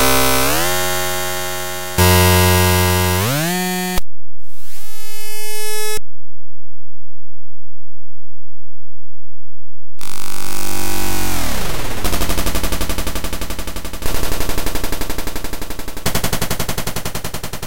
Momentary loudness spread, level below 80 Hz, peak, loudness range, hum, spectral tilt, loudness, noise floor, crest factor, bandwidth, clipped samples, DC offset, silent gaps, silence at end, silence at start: 15 LU; -30 dBFS; -2 dBFS; 14 LU; none; -3.5 dB/octave; -19 LUFS; -49 dBFS; 12 dB; 17 kHz; under 0.1%; 30%; none; 0 s; 0 s